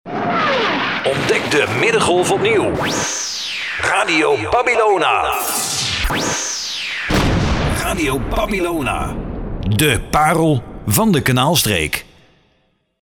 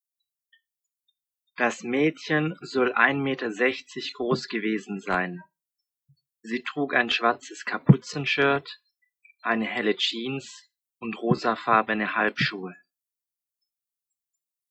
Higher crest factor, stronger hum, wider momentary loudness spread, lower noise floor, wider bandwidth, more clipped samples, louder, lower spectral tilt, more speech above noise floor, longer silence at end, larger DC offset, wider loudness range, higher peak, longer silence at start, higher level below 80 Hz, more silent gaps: second, 16 dB vs 26 dB; neither; second, 7 LU vs 13 LU; second, -62 dBFS vs -90 dBFS; first, 19.5 kHz vs 9 kHz; neither; first, -16 LUFS vs -25 LUFS; second, -4 dB/octave vs -5.5 dB/octave; second, 46 dB vs 64 dB; second, 1 s vs 1.95 s; neither; about the same, 2 LU vs 4 LU; about the same, -2 dBFS vs -2 dBFS; second, 0.05 s vs 1.6 s; first, -32 dBFS vs -68 dBFS; neither